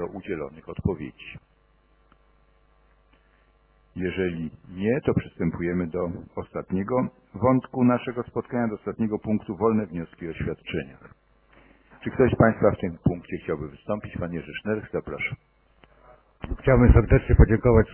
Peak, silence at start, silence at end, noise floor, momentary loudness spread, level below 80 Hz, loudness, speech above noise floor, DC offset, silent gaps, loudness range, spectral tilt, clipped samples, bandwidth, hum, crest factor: -4 dBFS; 0 s; 0 s; -62 dBFS; 16 LU; -32 dBFS; -25 LUFS; 38 dB; under 0.1%; none; 11 LU; -12 dB/octave; under 0.1%; 3.3 kHz; none; 22 dB